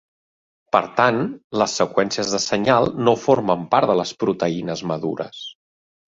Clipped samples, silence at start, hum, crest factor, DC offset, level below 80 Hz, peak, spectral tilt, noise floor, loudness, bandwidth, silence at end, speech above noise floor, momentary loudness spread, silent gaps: under 0.1%; 0.75 s; none; 20 dB; under 0.1%; -58 dBFS; 0 dBFS; -4.5 dB/octave; under -90 dBFS; -20 LUFS; 8 kHz; 0.6 s; over 70 dB; 9 LU; 1.44-1.50 s